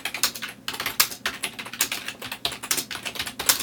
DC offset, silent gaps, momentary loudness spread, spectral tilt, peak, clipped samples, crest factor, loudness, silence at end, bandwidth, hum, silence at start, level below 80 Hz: under 0.1%; none; 9 LU; 0.5 dB/octave; 0 dBFS; under 0.1%; 28 dB; -26 LUFS; 0 s; 19.5 kHz; none; 0 s; -58 dBFS